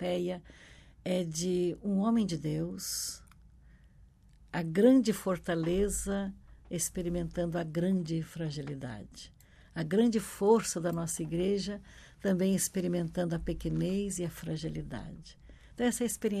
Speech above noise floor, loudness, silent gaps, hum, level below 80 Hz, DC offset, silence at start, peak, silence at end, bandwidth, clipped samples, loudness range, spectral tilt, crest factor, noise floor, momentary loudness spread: 28 dB; -32 LUFS; none; none; -52 dBFS; under 0.1%; 0 s; -14 dBFS; 0 s; 14.5 kHz; under 0.1%; 4 LU; -5.5 dB/octave; 20 dB; -59 dBFS; 15 LU